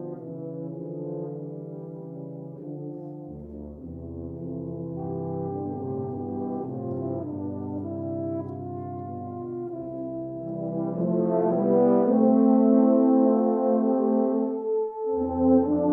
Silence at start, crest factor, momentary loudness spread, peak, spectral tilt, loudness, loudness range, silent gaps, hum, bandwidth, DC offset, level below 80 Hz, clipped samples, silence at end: 0 s; 16 dB; 19 LU; -8 dBFS; -14 dB/octave; -26 LUFS; 16 LU; none; none; 2.1 kHz; under 0.1%; -56 dBFS; under 0.1%; 0 s